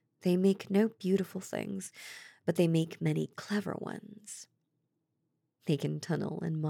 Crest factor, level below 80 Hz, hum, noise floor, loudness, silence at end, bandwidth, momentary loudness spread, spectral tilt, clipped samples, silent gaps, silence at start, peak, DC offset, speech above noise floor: 18 dB; under -90 dBFS; none; -81 dBFS; -33 LUFS; 0 s; 17 kHz; 17 LU; -6.5 dB/octave; under 0.1%; none; 0.25 s; -14 dBFS; under 0.1%; 49 dB